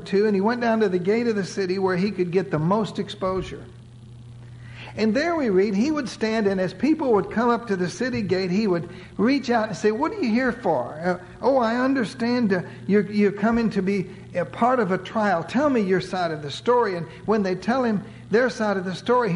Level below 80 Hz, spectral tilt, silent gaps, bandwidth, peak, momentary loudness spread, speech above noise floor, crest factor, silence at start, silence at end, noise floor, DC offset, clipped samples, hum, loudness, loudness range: -52 dBFS; -6.5 dB/octave; none; 11 kHz; -8 dBFS; 7 LU; 21 dB; 14 dB; 0 s; 0 s; -43 dBFS; under 0.1%; under 0.1%; none; -23 LUFS; 3 LU